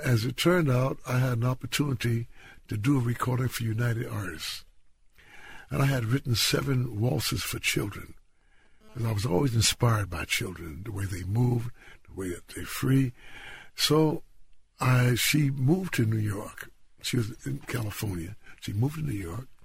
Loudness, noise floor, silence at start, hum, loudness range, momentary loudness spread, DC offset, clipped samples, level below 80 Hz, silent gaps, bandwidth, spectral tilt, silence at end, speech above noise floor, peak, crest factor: -28 LUFS; -59 dBFS; 0 s; none; 5 LU; 16 LU; under 0.1%; under 0.1%; -50 dBFS; none; 16 kHz; -5 dB/octave; 0 s; 32 dB; -10 dBFS; 18 dB